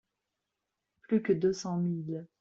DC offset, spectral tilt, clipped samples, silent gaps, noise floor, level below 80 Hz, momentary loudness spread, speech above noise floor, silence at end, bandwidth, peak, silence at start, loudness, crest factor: under 0.1%; -7.5 dB/octave; under 0.1%; none; -86 dBFS; -72 dBFS; 8 LU; 56 dB; 0.15 s; 7.8 kHz; -16 dBFS; 1.1 s; -31 LUFS; 16 dB